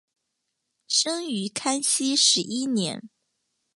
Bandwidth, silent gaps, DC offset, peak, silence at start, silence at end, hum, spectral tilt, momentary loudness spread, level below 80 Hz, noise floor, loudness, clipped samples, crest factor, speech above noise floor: 11.5 kHz; none; under 0.1%; -6 dBFS; 0.9 s; 0.7 s; none; -2 dB/octave; 10 LU; -76 dBFS; -79 dBFS; -23 LUFS; under 0.1%; 20 dB; 55 dB